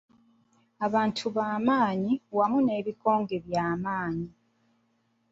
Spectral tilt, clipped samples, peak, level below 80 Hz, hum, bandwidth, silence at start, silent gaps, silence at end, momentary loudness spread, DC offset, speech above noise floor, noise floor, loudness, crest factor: -6.5 dB/octave; under 0.1%; -10 dBFS; -64 dBFS; none; 8 kHz; 0.8 s; none; 1.05 s; 7 LU; under 0.1%; 44 dB; -71 dBFS; -28 LUFS; 18 dB